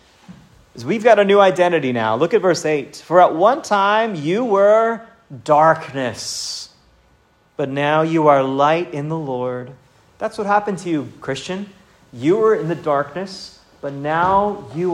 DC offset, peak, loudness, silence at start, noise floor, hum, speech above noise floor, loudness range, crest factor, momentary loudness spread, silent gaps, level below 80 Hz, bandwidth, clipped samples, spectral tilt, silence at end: under 0.1%; 0 dBFS; -17 LUFS; 0.3 s; -56 dBFS; none; 39 dB; 6 LU; 18 dB; 16 LU; none; -58 dBFS; 14 kHz; under 0.1%; -5.5 dB/octave; 0 s